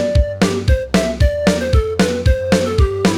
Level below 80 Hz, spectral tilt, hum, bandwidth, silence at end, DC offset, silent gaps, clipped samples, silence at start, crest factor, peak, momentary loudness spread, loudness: -20 dBFS; -6 dB/octave; none; 14.5 kHz; 0 s; under 0.1%; none; under 0.1%; 0 s; 12 dB; -2 dBFS; 2 LU; -16 LUFS